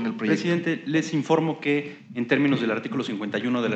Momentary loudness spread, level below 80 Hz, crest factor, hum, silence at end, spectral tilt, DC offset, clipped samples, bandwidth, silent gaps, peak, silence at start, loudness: 6 LU; -86 dBFS; 18 dB; none; 0 s; -6 dB/octave; under 0.1%; under 0.1%; 8.4 kHz; none; -6 dBFS; 0 s; -25 LUFS